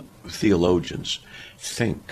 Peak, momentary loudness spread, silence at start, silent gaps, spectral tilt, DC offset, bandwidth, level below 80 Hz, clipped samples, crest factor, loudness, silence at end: -6 dBFS; 15 LU; 0 s; none; -5 dB/octave; under 0.1%; 14.5 kHz; -46 dBFS; under 0.1%; 18 dB; -24 LUFS; 0.1 s